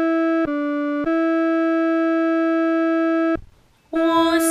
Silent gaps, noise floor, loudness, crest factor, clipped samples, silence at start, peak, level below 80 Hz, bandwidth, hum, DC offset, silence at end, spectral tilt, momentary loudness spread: none; -50 dBFS; -20 LUFS; 14 dB; under 0.1%; 0 s; -6 dBFS; -52 dBFS; 14.5 kHz; none; under 0.1%; 0 s; -3.5 dB/octave; 5 LU